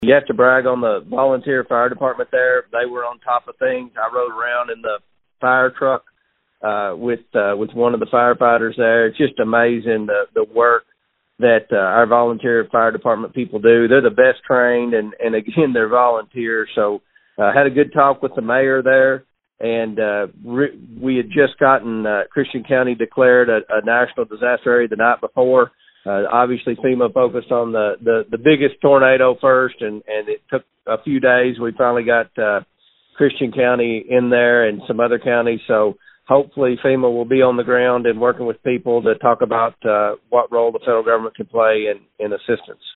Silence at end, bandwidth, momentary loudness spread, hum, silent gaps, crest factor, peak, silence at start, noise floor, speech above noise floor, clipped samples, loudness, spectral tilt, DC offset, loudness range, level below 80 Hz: 0.05 s; 4.1 kHz; 9 LU; none; none; 16 dB; 0 dBFS; 0 s; -65 dBFS; 48 dB; under 0.1%; -16 LUFS; -4 dB/octave; under 0.1%; 4 LU; -60 dBFS